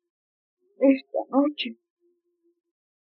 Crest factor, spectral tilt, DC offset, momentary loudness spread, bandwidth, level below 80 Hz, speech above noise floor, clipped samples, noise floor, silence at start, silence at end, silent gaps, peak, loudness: 20 dB; -2 dB/octave; under 0.1%; 10 LU; 5.6 kHz; under -90 dBFS; 48 dB; under 0.1%; -71 dBFS; 0.8 s; 1.4 s; none; -8 dBFS; -25 LUFS